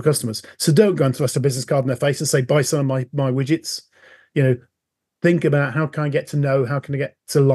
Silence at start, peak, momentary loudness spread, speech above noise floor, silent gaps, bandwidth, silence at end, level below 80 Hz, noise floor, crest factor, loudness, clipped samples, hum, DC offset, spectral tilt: 0 s; -2 dBFS; 8 LU; 62 dB; none; 12.5 kHz; 0 s; -66 dBFS; -80 dBFS; 18 dB; -20 LUFS; under 0.1%; none; under 0.1%; -5.5 dB/octave